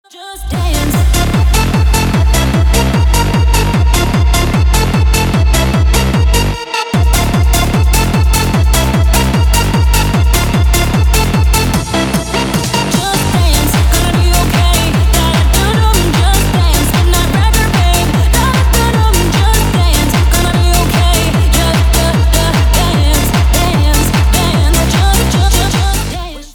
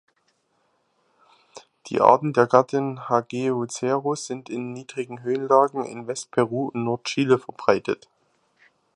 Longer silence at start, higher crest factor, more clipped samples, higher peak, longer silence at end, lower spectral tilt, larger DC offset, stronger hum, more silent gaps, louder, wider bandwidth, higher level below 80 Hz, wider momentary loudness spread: second, 0.15 s vs 1.55 s; second, 10 dB vs 24 dB; neither; about the same, 0 dBFS vs 0 dBFS; second, 0.05 s vs 1 s; about the same, -4.5 dB/octave vs -5.5 dB/octave; neither; neither; neither; first, -11 LUFS vs -23 LUFS; first, over 20 kHz vs 11.5 kHz; first, -12 dBFS vs -68 dBFS; second, 2 LU vs 14 LU